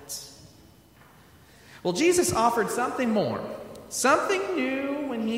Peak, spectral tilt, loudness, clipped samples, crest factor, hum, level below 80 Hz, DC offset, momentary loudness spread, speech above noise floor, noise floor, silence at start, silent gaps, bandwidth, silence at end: -8 dBFS; -3.5 dB/octave; -25 LUFS; under 0.1%; 18 dB; none; -60 dBFS; under 0.1%; 15 LU; 29 dB; -54 dBFS; 0 s; none; 16 kHz; 0 s